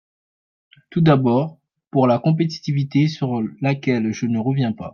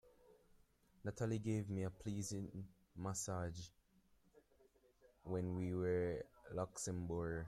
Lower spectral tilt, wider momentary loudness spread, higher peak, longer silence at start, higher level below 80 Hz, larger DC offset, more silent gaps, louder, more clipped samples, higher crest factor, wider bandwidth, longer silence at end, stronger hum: first, -8 dB/octave vs -6 dB/octave; second, 7 LU vs 11 LU; first, -4 dBFS vs -30 dBFS; first, 0.9 s vs 0.05 s; first, -60 dBFS vs -68 dBFS; neither; neither; first, -20 LUFS vs -44 LUFS; neither; about the same, 16 dB vs 16 dB; second, 7 kHz vs 13.5 kHz; about the same, 0.05 s vs 0 s; neither